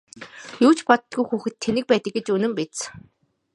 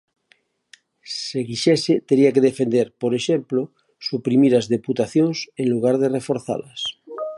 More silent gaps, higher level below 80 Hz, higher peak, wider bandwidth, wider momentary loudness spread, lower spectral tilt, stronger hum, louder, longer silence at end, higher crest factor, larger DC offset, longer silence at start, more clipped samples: neither; about the same, -62 dBFS vs -66 dBFS; first, 0 dBFS vs -4 dBFS; about the same, 11.5 kHz vs 11.5 kHz; first, 17 LU vs 12 LU; second, -4.5 dB/octave vs -6 dB/octave; neither; about the same, -22 LUFS vs -20 LUFS; first, 0.55 s vs 0 s; first, 22 dB vs 16 dB; neither; second, 0.2 s vs 1.05 s; neither